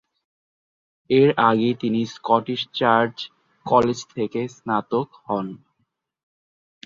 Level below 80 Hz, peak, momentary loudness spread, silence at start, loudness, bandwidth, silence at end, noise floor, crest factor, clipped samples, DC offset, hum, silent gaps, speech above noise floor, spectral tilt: -62 dBFS; -2 dBFS; 10 LU; 1.1 s; -21 LUFS; 7.6 kHz; 1.3 s; -73 dBFS; 20 dB; under 0.1%; under 0.1%; none; none; 52 dB; -6 dB/octave